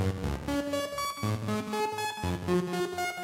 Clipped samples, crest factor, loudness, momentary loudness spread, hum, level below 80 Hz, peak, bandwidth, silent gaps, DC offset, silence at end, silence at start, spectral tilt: under 0.1%; 14 dB; -32 LUFS; 3 LU; none; -48 dBFS; -16 dBFS; 16 kHz; none; under 0.1%; 0 s; 0 s; -5.5 dB/octave